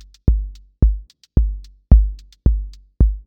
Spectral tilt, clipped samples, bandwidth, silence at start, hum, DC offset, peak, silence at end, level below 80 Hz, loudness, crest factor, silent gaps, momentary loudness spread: -10.5 dB/octave; under 0.1%; 1.4 kHz; 0.25 s; none; under 0.1%; 0 dBFS; 0.05 s; -18 dBFS; -20 LUFS; 16 dB; none; 16 LU